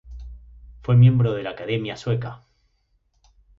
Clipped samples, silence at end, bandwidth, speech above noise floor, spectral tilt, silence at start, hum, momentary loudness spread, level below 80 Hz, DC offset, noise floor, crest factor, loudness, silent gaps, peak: under 0.1%; 1.25 s; 7 kHz; 47 dB; -8.5 dB/octave; 0.1 s; none; 26 LU; -46 dBFS; under 0.1%; -67 dBFS; 18 dB; -21 LUFS; none; -6 dBFS